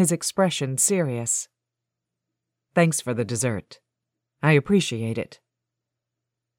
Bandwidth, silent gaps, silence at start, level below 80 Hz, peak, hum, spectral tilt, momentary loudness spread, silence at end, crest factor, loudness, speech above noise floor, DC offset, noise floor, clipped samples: 17 kHz; none; 0 s; -64 dBFS; -6 dBFS; none; -4.5 dB/octave; 10 LU; 1.25 s; 20 dB; -23 LUFS; 62 dB; under 0.1%; -85 dBFS; under 0.1%